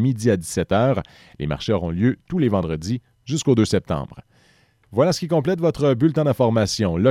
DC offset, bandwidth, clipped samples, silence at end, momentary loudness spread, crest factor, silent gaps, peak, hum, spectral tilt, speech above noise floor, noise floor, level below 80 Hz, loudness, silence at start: under 0.1%; 15 kHz; under 0.1%; 0 s; 9 LU; 16 dB; none; -6 dBFS; none; -6.5 dB/octave; 38 dB; -58 dBFS; -44 dBFS; -21 LUFS; 0 s